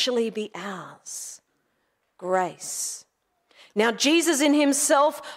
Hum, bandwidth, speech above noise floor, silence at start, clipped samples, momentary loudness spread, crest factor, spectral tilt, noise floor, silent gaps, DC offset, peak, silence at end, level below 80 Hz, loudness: none; 16 kHz; 49 dB; 0 s; under 0.1%; 17 LU; 16 dB; -2 dB/octave; -73 dBFS; none; under 0.1%; -8 dBFS; 0 s; -82 dBFS; -23 LUFS